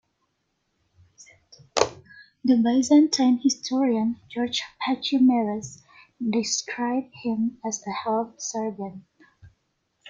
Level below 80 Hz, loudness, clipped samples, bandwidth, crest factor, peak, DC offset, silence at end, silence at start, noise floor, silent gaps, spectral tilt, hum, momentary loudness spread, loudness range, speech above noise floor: -66 dBFS; -24 LUFS; under 0.1%; 7.8 kHz; 24 dB; -2 dBFS; under 0.1%; 0 s; 1.2 s; -75 dBFS; none; -3.5 dB/octave; none; 11 LU; 6 LU; 51 dB